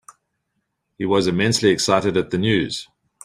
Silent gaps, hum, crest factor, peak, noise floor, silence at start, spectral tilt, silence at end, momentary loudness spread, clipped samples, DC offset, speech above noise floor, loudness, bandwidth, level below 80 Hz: none; none; 18 dB; -2 dBFS; -74 dBFS; 1 s; -4.5 dB/octave; 0.4 s; 10 LU; under 0.1%; under 0.1%; 55 dB; -19 LUFS; 14.5 kHz; -54 dBFS